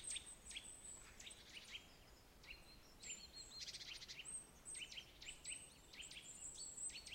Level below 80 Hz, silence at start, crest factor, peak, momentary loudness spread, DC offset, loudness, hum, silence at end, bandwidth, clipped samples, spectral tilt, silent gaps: -70 dBFS; 0 s; 20 dB; -36 dBFS; 10 LU; under 0.1%; -53 LUFS; none; 0 s; 16 kHz; under 0.1%; 0 dB/octave; none